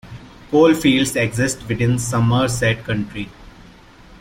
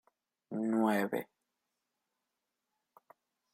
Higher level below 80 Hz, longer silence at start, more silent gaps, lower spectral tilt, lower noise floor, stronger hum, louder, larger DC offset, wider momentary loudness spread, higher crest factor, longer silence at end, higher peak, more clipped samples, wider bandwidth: first, -42 dBFS vs -86 dBFS; second, 0.05 s vs 0.5 s; neither; second, -5 dB/octave vs -6.5 dB/octave; second, -44 dBFS vs -87 dBFS; neither; first, -18 LUFS vs -34 LUFS; neither; about the same, 14 LU vs 13 LU; second, 16 dB vs 22 dB; second, 0.75 s vs 2.3 s; first, -2 dBFS vs -16 dBFS; neither; about the same, 16.5 kHz vs 16 kHz